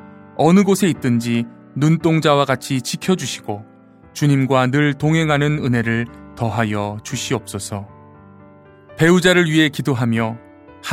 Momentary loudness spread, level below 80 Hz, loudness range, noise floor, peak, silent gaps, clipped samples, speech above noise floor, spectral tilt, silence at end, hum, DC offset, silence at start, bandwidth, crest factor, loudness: 15 LU; -52 dBFS; 4 LU; -44 dBFS; -2 dBFS; none; under 0.1%; 28 dB; -5.5 dB/octave; 0 s; none; under 0.1%; 0.05 s; 16 kHz; 16 dB; -17 LUFS